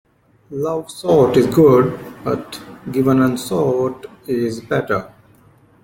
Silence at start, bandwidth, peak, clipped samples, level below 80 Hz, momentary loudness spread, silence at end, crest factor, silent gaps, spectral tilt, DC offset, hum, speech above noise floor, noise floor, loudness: 0.5 s; 17 kHz; -2 dBFS; under 0.1%; -50 dBFS; 14 LU; 0.75 s; 16 dB; none; -7 dB/octave; under 0.1%; none; 34 dB; -50 dBFS; -17 LUFS